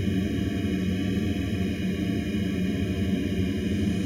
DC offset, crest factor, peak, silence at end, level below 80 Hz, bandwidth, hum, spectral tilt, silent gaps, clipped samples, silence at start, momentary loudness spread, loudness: under 0.1%; 12 dB; -14 dBFS; 0 s; -40 dBFS; 14.5 kHz; none; -7 dB/octave; none; under 0.1%; 0 s; 1 LU; -27 LUFS